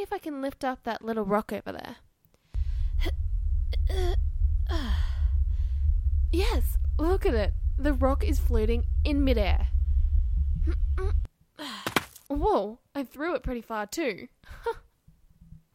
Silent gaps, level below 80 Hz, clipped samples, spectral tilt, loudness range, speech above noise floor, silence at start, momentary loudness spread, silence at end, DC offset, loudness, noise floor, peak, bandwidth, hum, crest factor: none; -28 dBFS; under 0.1%; -6.5 dB/octave; 5 LU; 33 dB; 0 s; 10 LU; 0.95 s; under 0.1%; -29 LUFS; -59 dBFS; -8 dBFS; 16 kHz; none; 20 dB